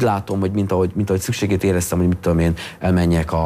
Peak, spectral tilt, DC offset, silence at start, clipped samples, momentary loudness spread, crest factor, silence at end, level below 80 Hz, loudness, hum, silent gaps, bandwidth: -6 dBFS; -6.5 dB/octave; under 0.1%; 0 s; under 0.1%; 3 LU; 12 dB; 0 s; -34 dBFS; -19 LUFS; none; none; 16 kHz